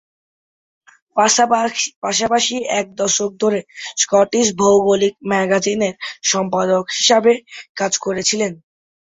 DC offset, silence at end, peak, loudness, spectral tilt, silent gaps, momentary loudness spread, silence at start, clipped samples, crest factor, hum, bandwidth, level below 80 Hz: under 0.1%; 0.6 s; -2 dBFS; -16 LUFS; -2.5 dB/octave; 1.96-2.02 s, 7.69-7.75 s; 8 LU; 1.15 s; under 0.1%; 16 dB; none; 8.4 kHz; -58 dBFS